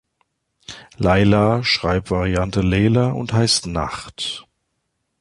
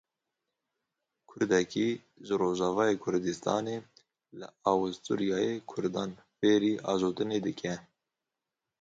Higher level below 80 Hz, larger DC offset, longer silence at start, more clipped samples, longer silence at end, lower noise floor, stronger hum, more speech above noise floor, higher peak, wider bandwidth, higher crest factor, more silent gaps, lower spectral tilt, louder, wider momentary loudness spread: first, -36 dBFS vs -68 dBFS; neither; second, 0.7 s vs 1.3 s; neither; second, 0.8 s vs 1 s; second, -73 dBFS vs -89 dBFS; neither; second, 55 dB vs 59 dB; first, -2 dBFS vs -12 dBFS; first, 11.5 kHz vs 7.8 kHz; about the same, 16 dB vs 20 dB; neither; about the same, -5 dB/octave vs -5.5 dB/octave; first, -18 LUFS vs -31 LUFS; about the same, 13 LU vs 11 LU